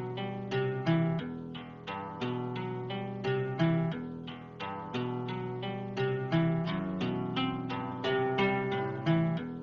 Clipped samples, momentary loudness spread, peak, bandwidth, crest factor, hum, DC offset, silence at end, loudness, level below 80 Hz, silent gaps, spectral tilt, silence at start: under 0.1%; 11 LU; -16 dBFS; 6.6 kHz; 16 dB; none; under 0.1%; 0 s; -33 LUFS; -64 dBFS; none; -8 dB/octave; 0 s